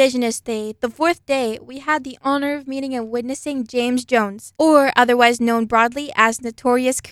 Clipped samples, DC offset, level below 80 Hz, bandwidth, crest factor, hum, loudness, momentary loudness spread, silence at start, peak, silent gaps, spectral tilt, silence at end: under 0.1%; under 0.1%; -58 dBFS; 15.5 kHz; 18 dB; none; -19 LUFS; 11 LU; 0 s; 0 dBFS; none; -3 dB/octave; 0 s